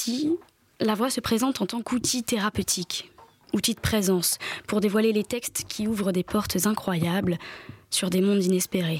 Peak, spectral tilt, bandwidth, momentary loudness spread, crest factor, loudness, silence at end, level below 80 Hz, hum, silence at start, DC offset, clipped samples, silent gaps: -12 dBFS; -4 dB/octave; 16.5 kHz; 7 LU; 14 dB; -25 LUFS; 0 s; -52 dBFS; none; 0 s; under 0.1%; under 0.1%; none